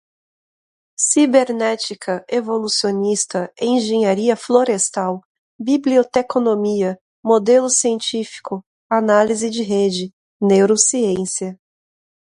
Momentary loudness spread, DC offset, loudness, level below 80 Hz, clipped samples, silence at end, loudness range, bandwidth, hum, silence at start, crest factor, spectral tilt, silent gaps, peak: 12 LU; under 0.1%; -17 LUFS; -64 dBFS; under 0.1%; 0.7 s; 1 LU; 11.5 kHz; none; 1 s; 18 dB; -3.5 dB/octave; 5.25-5.59 s, 7.01-7.23 s, 8.66-8.90 s, 10.13-10.40 s; 0 dBFS